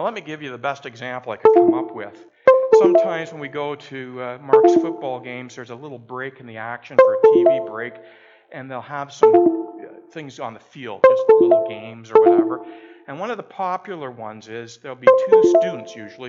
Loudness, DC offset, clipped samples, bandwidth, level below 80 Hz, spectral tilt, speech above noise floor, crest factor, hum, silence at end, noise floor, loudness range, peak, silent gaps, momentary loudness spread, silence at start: -17 LUFS; under 0.1%; under 0.1%; 7.4 kHz; -72 dBFS; -6.5 dB/octave; 17 dB; 18 dB; none; 0 s; -36 dBFS; 4 LU; 0 dBFS; none; 21 LU; 0 s